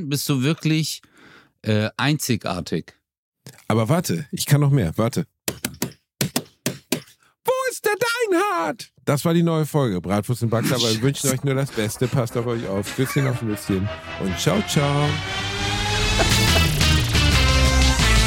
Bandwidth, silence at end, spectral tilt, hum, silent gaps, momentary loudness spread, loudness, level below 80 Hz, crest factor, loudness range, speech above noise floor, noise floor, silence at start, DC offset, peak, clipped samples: 17 kHz; 0 s; -4.5 dB/octave; none; 3.18-3.32 s; 11 LU; -21 LUFS; -30 dBFS; 18 dB; 5 LU; 29 dB; -50 dBFS; 0 s; under 0.1%; -4 dBFS; under 0.1%